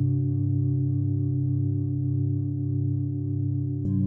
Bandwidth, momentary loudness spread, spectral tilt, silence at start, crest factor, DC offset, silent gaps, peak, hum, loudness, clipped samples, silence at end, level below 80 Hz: 1.2 kHz; 3 LU; -15.5 dB/octave; 0 s; 10 dB; under 0.1%; none; -14 dBFS; none; -27 LUFS; under 0.1%; 0 s; -60 dBFS